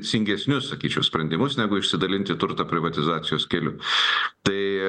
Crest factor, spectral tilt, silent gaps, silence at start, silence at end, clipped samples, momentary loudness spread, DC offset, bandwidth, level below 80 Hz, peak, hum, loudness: 20 dB; -4.5 dB/octave; none; 0 s; 0 s; under 0.1%; 4 LU; under 0.1%; 10 kHz; -56 dBFS; -4 dBFS; none; -23 LUFS